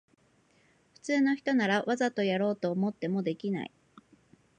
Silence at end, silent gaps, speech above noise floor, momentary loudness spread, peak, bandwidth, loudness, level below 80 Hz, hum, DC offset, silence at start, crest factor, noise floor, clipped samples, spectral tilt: 0.9 s; none; 38 dB; 8 LU; -12 dBFS; 9.6 kHz; -30 LUFS; -78 dBFS; none; under 0.1%; 1.05 s; 18 dB; -67 dBFS; under 0.1%; -6 dB/octave